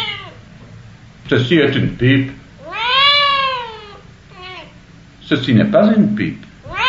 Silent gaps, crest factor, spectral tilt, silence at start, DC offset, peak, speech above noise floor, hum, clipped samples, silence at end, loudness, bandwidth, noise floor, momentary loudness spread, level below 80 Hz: none; 16 dB; -3.5 dB/octave; 0 s; 0.1%; -2 dBFS; 28 dB; none; under 0.1%; 0 s; -14 LUFS; 7.6 kHz; -42 dBFS; 23 LU; -44 dBFS